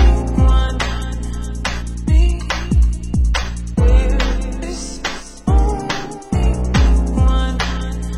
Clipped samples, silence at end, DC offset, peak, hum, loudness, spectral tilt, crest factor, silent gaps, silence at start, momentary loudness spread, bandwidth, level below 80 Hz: under 0.1%; 0 s; under 0.1%; -2 dBFS; none; -18 LUFS; -5.5 dB/octave; 14 dB; none; 0 s; 10 LU; 11.5 kHz; -16 dBFS